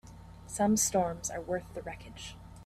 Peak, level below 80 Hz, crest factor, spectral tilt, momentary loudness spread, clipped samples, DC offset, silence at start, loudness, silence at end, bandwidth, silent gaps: -16 dBFS; -54 dBFS; 18 dB; -4 dB/octave; 19 LU; under 0.1%; under 0.1%; 0.05 s; -31 LUFS; 0 s; 15.5 kHz; none